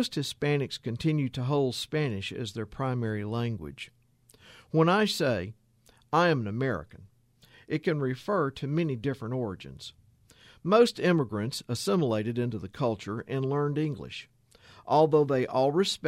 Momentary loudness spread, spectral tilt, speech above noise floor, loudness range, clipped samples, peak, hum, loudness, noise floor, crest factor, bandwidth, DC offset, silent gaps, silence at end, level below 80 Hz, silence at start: 14 LU; -6 dB/octave; 34 dB; 4 LU; under 0.1%; -8 dBFS; none; -28 LUFS; -62 dBFS; 20 dB; 15.5 kHz; under 0.1%; none; 0 s; -60 dBFS; 0 s